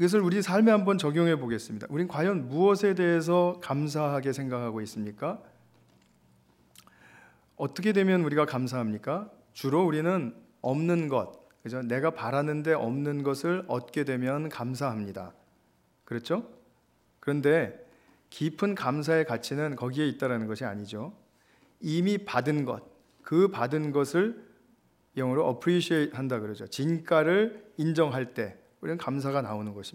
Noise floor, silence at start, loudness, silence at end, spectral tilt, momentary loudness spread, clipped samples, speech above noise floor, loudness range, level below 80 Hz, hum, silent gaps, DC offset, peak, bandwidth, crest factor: -67 dBFS; 0 s; -28 LUFS; 0.05 s; -6.5 dB/octave; 12 LU; under 0.1%; 40 dB; 6 LU; -74 dBFS; none; none; under 0.1%; -10 dBFS; 16 kHz; 18 dB